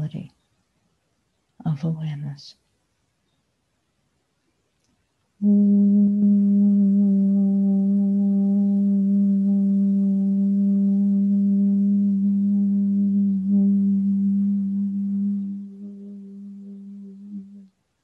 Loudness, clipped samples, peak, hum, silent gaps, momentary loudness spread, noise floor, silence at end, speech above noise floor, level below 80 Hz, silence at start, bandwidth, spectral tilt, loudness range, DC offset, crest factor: -20 LUFS; under 0.1%; -10 dBFS; none; none; 21 LU; -71 dBFS; 0.4 s; 52 dB; -66 dBFS; 0 s; 4.8 kHz; -11.5 dB/octave; 14 LU; under 0.1%; 10 dB